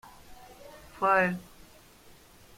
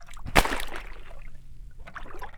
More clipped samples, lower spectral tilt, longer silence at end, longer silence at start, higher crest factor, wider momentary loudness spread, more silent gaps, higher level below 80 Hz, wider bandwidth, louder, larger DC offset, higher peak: neither; first, -6 dB/octave vs -3.5 dB/octave; first, 1.15 s vs 0 s; first, 0.3 s vs 0 s; second, 22 dB vs 30 dB; about the same, 26 LU vs 25 LU; neither; second, -60 dBFS vs -36 dBFS; second, 16.5 kHz vs over 20 kHz; about the same, -27 LUFS vs -26 LUFS; neither; second, -12 dBFS vs 0 dBFS